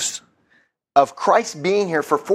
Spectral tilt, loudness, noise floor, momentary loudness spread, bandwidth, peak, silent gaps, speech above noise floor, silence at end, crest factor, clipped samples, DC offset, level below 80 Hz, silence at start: -3.5 dB/octave; -19 LUFS; -61 dBFS; 6 LU; 15.5 kHz; 0 dBFS; none; 43 dB; 0 s; 20 dB; under 0.1%; under 0.1%; -68 dBFS; 0 s